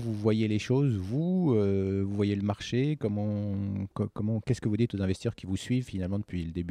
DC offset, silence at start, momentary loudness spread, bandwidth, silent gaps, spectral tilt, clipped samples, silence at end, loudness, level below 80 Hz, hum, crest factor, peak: under 0.1%; 0 s; 7 LU; 10.5 kHz; none; -7.5 dB/octave; under 0.1%; 0 s; -30 LUFS; -56 dBFS; none; 14 dB; -14 dBFS